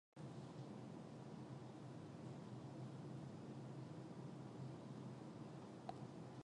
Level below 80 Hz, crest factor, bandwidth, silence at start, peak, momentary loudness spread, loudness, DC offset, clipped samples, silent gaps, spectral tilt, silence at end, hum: -82 dBFS; 20 dB; 10.5 kHz; 0.15 s; -34 dBFS; 2 LU; -55 LUFS; under 0.1%; under 0.1%; none; -7.5 dB/octave; 0 s; none